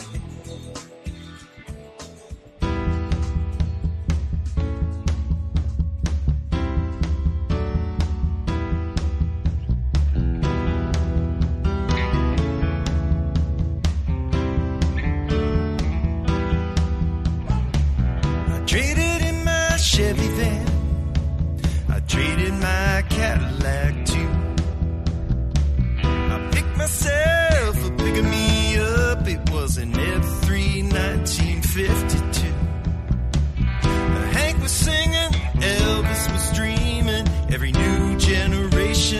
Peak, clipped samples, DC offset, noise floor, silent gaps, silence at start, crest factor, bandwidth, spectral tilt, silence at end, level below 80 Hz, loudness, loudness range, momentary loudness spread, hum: -4 dBFS; under 0.1%; under 0.1%; -41 dBFS; none; 0 s; 16 dB; 13.5 kHz; -5 dB/octave; 0 s; -24 dBFS; -22 LUFS; 5 LU; 7 LU; none